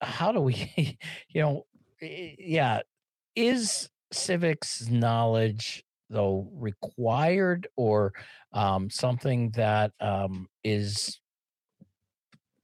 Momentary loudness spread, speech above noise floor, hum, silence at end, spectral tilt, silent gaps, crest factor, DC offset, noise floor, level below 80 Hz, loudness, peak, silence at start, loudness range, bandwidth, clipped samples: 12 LU; over 63 dB; none; 1.5 s; -5 dB/octave; none; 14 dB; under 0.1%; under -90 dBFS; -66 dBFS; -28 LUFS; -14 dBFS; 0 s; 3 LU; 12.5 kHz; under 0.1%